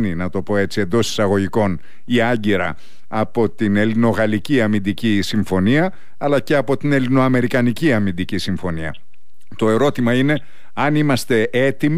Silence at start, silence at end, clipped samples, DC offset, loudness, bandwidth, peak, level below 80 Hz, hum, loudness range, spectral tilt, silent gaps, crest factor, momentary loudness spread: 0 s; 0 s; under 0.1%; 5%; -18 LUFS; 15.5 kHz; -6 dBFS; -48 dBFS; none; 2 LU; -6.5 dB/octave; none; 12 dB; 7 LU